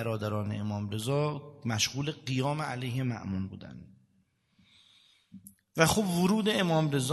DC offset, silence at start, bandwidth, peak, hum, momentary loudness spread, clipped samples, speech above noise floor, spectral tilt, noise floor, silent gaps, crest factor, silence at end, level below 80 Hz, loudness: under 0.1%; 0 s; 12.5 kHz; -6 dBFS; none; 12 LU; under 0.1%; 41 dB; -5 dB/octave; -71 dBFS; none; 24 dB; 0 s; -62 dBFS; -30 LUFS